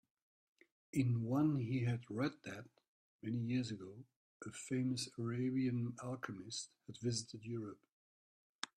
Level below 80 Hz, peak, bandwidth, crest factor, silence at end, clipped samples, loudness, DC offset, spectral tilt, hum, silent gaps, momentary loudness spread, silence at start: -76 dBFS; -20 dBFS; 13 kHz; 22 dB; 0.1 s; under 0.1%; -41 LUFS; under 0.1%; -6 dB/octave; none; 2.88-3.19 s, 4.16-4.40 s, 7.92-8.62 s; 15 LU; 0.95 s